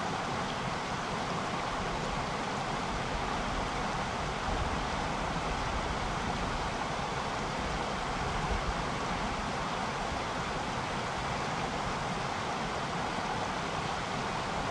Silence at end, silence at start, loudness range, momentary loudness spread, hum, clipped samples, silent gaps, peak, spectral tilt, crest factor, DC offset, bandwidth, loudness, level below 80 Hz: 0 s; 0 s; 0 LU; 1 LU; none; under 0.1%; none; -20 dBFS; -4.5 dB/octave; 14 dB; under 0.1%; 12.5 kHz; -34 LUFS; -44 dBFS